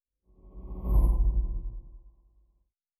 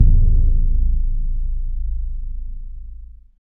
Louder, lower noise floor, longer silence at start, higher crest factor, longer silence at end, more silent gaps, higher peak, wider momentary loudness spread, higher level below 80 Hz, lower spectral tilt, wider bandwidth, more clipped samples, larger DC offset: second, -30 LUFS vs -23 LUFS; first, -73 dBFS vs -36 dBFS; first, 0.45 s vs 0 s; about the same, 16 dB vs 16 dB; first, 1 s vs 0.3 s; neither; second, -14 dBFS vs 0 dBFS; about the same, 20 LU vs 19 LU; second, -30 dBFS vs -16 dBFS; second, -11 dB/octave vs -14.5 dB/octave; first, 11.5 kHz vs 0.6 kHz; neither; second, under 0.1% vs 0.9%